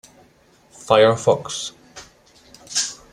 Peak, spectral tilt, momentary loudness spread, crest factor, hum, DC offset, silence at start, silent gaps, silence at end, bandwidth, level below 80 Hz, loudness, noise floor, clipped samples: 0 dBFS; -3 dB/octave; 21 LU; 22 dB; none; under 0.1%; 0.8 s; none; 0.2 s; 14 kHz; -58 dBFS; -19 LUFS; -55 dBFS; under 0.1%